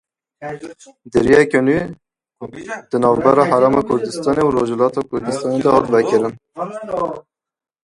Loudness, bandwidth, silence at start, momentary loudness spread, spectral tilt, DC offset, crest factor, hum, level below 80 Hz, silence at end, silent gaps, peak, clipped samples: -16 LUFS; 11.5 kHz; 0.4 s; 19 LU; -6.5 dB/octave; under 0.1%; 18 dB; none; -48 dBFS; 0.65 s; none; 0 dBFS; under 0.1%